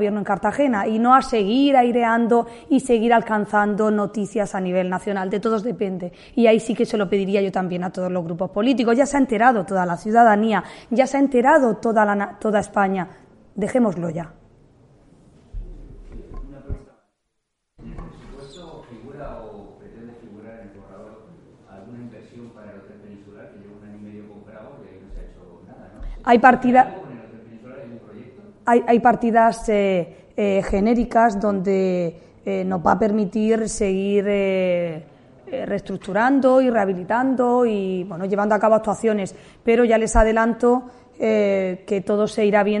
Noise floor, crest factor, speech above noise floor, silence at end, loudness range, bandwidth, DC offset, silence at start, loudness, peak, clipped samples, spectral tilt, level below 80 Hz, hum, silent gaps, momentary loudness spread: -76 dBFS; 20 dB; 58 dB; 0 s; 22 LU; 11.5 kHz; under 0.1%; 0 s; -19 LUFS; 0 dBFS; under 0.1%; -6 dB/octave; -42 dBFS; none; none; 23 LU